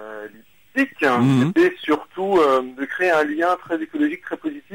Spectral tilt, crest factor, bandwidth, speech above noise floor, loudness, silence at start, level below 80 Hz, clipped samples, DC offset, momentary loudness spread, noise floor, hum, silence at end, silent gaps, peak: -6.5 dB/octave; 12 dB; 16 kHz; 27 dB; -20 LUFS; 0 s; -60 dBFS; under 0.1%; 0.1%; 12 LU; -47 dBFS; none; 0 s; none; -8 dBFS